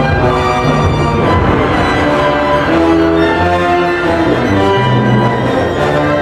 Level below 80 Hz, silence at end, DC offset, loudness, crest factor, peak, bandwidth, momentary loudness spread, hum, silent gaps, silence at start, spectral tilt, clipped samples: -28 dBFS; 0 s; under 0.1%; -11 LUFS; 10 dB; 0 dBFS; 13 kHz; 2 LU; none; none; 0 s; -7 dB/octave; under 0.1%